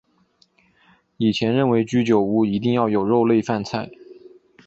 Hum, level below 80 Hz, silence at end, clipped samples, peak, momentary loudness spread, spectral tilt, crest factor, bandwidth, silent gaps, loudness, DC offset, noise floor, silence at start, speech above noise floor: none; -58 dBFS; 0.55 s; under 0.1%; -4 dBFS; 7 LU; -7 dB/octave; 16 dB; 8 kHz; none; -20 LUFS; under 0.1%; -61 dBFS; 1.2 s; 42 dB